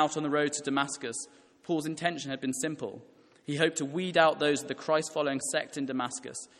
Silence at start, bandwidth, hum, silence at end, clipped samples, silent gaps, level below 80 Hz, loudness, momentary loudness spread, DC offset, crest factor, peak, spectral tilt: 0 s; 13.5 kHz; none; 0.15 s; under 0.1%; none; -76 dBFS; -30 LUFS; 14 LU; under 0.1%; 24 dB; -8 dBFS; -3.5 dB/octave